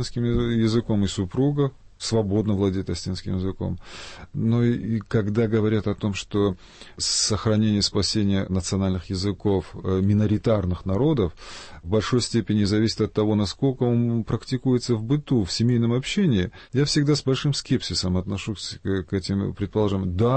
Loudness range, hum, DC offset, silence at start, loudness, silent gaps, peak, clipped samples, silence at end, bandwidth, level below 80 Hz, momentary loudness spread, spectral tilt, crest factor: 3 LU; none; under 0.1%; 0 s; -24 LUFS; none; -10 dBFS; under 0.1%; 0 s; 8.8 kHz; -44 dBFS; 7 LU; -6 dB/octave; 14 dB